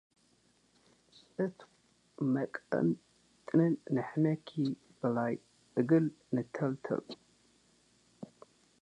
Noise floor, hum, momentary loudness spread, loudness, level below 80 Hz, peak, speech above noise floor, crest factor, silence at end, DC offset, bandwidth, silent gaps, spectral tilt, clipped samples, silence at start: -70 dBFS; none; 21 LU; -34 LUFS; -78 dBFS; -16 dBFS; 38 dB; 20 dB; 0.55 s; under 0.1%; 9.8 kHz; none; -9 dB/octave; under 0.1%; 1.4 s